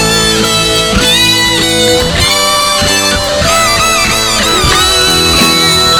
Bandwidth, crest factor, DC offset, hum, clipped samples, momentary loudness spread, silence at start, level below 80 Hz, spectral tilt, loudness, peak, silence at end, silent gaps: over 20 kHz; 8 dB; under 0.1%; none; 0.3%; 3 LU; 0 s; -24 dBFS; -2 dB/octave; -7 LUFS; 0 dBFS; 0 s; none